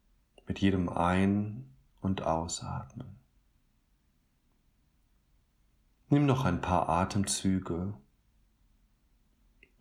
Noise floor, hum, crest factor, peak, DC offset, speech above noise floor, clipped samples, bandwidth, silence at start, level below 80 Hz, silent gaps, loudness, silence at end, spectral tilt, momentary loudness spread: -71 dBFS; none; 20 dB; -12 dBFS; under 0.1%; 42 dB; under 0.1%; 15 kHz; 0.5 s; -54 dBFS; none; -31 LUFS; 1.8 s; -5.5 dB/octave; 14 LU